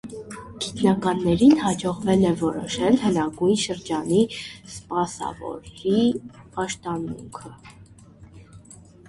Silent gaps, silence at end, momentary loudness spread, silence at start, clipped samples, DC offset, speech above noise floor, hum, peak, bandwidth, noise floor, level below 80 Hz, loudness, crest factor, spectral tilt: none; 0.35 s; 17 LU; 0.05 s; under 0.1%; under 0.1%; 25 dB; none; -6 dBFS; 11.5 kHz; -48 dBFS; -52 dBFS; -23 LUFS; 18 dB; -5.5 dB/octave